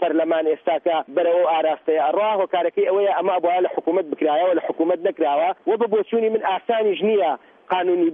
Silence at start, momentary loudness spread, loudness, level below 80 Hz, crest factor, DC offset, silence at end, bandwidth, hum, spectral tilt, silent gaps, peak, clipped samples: 0 s; 3 LU; -20 LUFS; -78 dBFS; 12 dB; under 0.1%; 0 s; 3.8 kHz; none; -8.5 dB/octave; none; -8 dBFS; under 0.1%